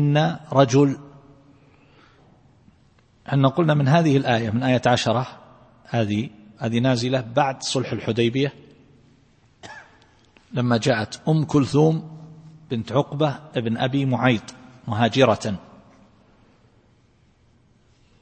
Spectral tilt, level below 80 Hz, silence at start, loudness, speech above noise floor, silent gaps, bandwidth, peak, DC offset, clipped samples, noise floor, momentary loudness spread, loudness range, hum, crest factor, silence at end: -6.5 dB/octave; -58 dBFS; 0 s; -21 LUFS; 38 dB; none; 8.8 kHz; -2 dBFS; under 0.1%; under 0.1%; -58 dBFS; 17 LU; 5 LU; none; 20 dB; 2.6 s